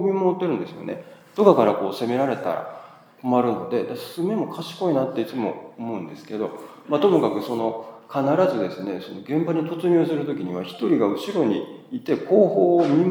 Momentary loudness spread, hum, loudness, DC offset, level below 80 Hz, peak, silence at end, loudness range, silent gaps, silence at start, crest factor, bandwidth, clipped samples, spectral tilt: 15 LU; none; -23 LUFS; under 0.1%; -80 dBFS; -2 dBFS; 0 s; 3 LU; none; 0 s; 20 dB; 19 kHz; under 0.1%; -7.5 dB/octave